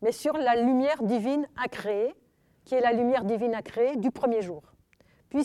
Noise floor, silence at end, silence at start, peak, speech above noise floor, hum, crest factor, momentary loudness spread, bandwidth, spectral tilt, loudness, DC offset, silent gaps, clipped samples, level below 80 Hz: -63 dBFS; 0 s; 0 s; -12 dBFS; 37 dB; none; 16 dB; 8 LU; 13.5 kHz; -6 dB/octave; -27 LUFS; under 0.1%; none; under 0.1%; -66 dBFS